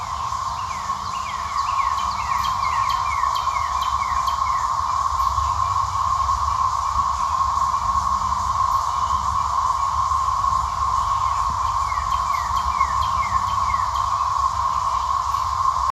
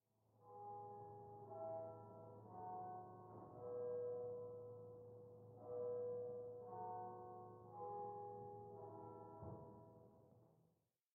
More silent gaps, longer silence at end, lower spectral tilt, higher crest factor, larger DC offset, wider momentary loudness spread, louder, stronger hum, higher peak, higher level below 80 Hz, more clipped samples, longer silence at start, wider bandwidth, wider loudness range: neither; second, 0 s vs 0.5 s; second, -2.5 dB/octave vs -6.5 dB/octave; about the same, 16 dB vs 14 dB; neither; second, 2 LU vs 12 LU; first, -21 LUFS vs -53 LUFS; neither; first, -6 dBFS vs -40 dBFS; first, -36 dBFS vs -86 dBFS; neither; second, 0 s vs 0.35 s; first, 14.5 kHz vs 2 kHz; second, 1 LU vs 5 LU